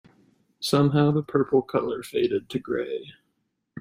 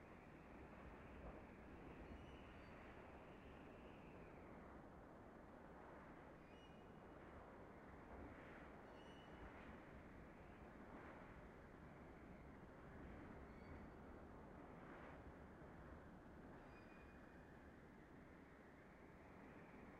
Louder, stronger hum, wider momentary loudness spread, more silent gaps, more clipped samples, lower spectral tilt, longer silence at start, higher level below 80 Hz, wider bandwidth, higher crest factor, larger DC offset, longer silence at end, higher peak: first, -25 LUFS vs -61 LUFS; neither; first, 10 LU vs 4 LU; neither; neither; about the same, -6.5 dB/octave vs -7 dB/octave; first, 0.6 s vs 0 s; first, -62 dBFS vs -68 dBFS; first, 16 kHz vs 8.8 kHz; about the same, 18 dB vs 16 dB; neither; about the same, 0 s vs 0 s; first, -8 dBFS vs -46 dBFS